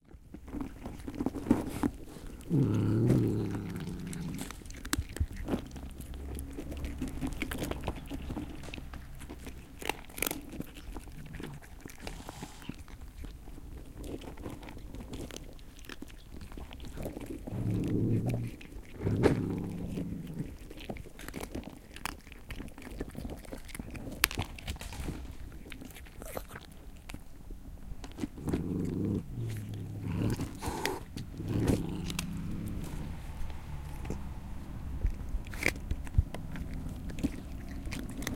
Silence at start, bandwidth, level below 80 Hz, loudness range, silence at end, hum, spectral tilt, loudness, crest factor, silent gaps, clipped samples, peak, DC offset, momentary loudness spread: 0.1 s; 17 kHz; -44 dBFS; 13 LU; 0 s; none; -5.5 dB/octave; -37 LUFS; 34 dB; none; under 0.1%; -2 dBFS; under 0.1%; 17 LU